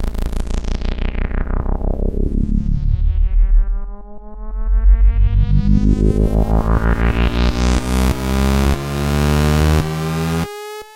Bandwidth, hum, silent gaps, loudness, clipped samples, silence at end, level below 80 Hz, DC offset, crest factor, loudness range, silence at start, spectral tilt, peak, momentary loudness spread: 16 kHz; none; none; -18 LUFS; under 0.1%; 0.05 s; -16 dBFS; under 0.1%; 14 dB; 5 LU; 0 s; -6.5 dB/octave; 0 dBFS; 10 LU